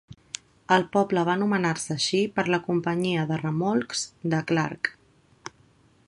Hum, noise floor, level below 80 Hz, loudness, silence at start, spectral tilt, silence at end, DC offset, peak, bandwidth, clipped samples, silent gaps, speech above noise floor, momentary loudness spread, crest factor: none; -60 dBFS; -64 dBFS; -25 LUFS; 0.1 s; -5 dB/octave; 1.15 s; under 0.1%; -4 dBFS; 11.5 kHz; under 0.1%; none; 35 dB; 15 LU; 22 dB